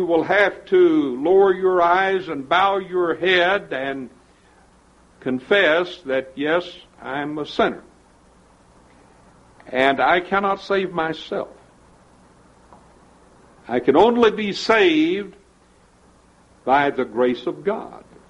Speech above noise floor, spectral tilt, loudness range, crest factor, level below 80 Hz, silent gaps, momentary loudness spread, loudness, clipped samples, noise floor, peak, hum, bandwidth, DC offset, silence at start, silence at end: 35 dB; -5.5 dB/octave; 8 LU; 18 dB; -56 dBFS; none; 13 LU; -19 LUFS; under 0.1%; -54 dBFS; -2 dBFS; none; 9 kHz; under 0.1%; 0 s; 0.35 s